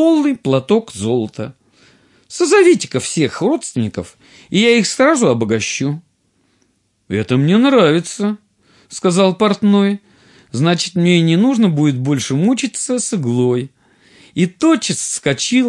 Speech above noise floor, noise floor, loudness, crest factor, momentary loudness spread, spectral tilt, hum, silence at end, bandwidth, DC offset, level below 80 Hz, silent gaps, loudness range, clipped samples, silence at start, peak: 47 dB; -61 dBFS; -15 LUFS; 14 dB; 11 LU; -5 dB/octave; none; 0 s; 12 kHz; under 0.1%; -60 dBFS; none; 3 LU; under 0.1%; 0 s; 0 dBFS